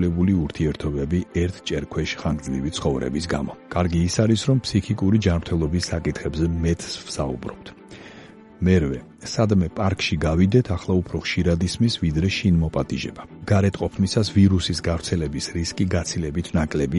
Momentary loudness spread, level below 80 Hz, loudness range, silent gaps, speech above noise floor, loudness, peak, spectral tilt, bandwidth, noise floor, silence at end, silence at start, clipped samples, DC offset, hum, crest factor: 8 LU; -36 dBFS; 4 LU; none; 22 dB; -23 LUFS; -4 dBFS; -6 dB/octave; 11.5 kHz; -44 dBFS; 0 s; 0 s; under 0.1%; under 0.1%; none; 18 dB